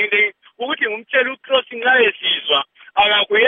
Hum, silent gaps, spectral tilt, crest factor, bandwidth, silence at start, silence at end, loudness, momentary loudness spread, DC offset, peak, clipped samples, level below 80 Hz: none; none; -5 dB/octave; 16 dB; 3.9 kHz; 0 s; 0 s; -17 LUFS; 7 LU; under 0.1%; -2 dBFS; under 0.1%; -62 dBFS